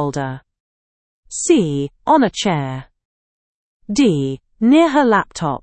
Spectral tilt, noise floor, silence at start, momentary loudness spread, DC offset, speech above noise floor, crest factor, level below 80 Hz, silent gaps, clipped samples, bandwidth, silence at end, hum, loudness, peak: -5 dB/octave; under -90 dBFS; 0 s; 14 LU; under 0.1%; over 74 dB; 16 dB; -50 dBFS; 0.60-1.23 s, 3.05-3.80 s; under 0.1%; 8.8 kHz; 0.05 s; none; -16 LUFS; -2 dBFS